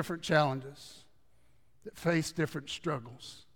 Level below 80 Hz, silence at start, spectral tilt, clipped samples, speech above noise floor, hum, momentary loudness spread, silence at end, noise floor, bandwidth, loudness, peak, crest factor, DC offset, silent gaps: -66 dBFS; 0 s; -5 dB/octave; under 0.1%; 36 dB; none; 22 LU; 0.15 s; -70 dBFS; 18 kHz; -33 LUFS; -12 dBFS; 22 dB; 0.1%; none